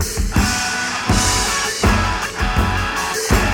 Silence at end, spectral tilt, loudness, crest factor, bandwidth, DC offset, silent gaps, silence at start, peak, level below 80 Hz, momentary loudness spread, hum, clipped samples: 0 s; -3.5 dB/octave; -18 LUFS; 16 dB; 19 kHz; under 0.1%; none; 0 s; 0 dBFS; -24 dBFS; 4 LU; none; under 0.1%